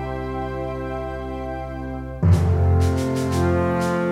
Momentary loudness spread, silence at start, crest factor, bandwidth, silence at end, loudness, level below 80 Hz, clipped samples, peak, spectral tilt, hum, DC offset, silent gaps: 12 LU; 0 s; 14 dB; 13 kHz; 0 s; -22 LUFS; -32 dBFS; under 0.1%; -6 dBFS; -7.5 dB/octave; none; under 0.1%; none